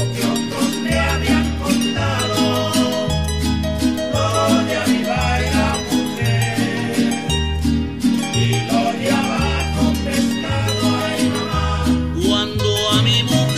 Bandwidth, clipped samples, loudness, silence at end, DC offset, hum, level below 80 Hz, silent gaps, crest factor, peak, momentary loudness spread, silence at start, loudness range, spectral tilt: 16 kHz; under 0.1%; -18 LUFS; 0 s; 0.6%; none; -30 dBFS; none; 14 dB; -4 dBFS; 4 LU; 0 s; 1 LU; -5 dB/octave